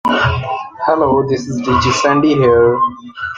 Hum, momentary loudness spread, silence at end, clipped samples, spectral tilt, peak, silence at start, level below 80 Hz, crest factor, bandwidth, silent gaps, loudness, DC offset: none; 8 LU; 0 s; under 0.1%; -5.5 dB/octave; -2 dBFS; 0.05 s; -40 dBFS; 12 dB; 9.2 kHz; none; -14 LUFS; under 0.1%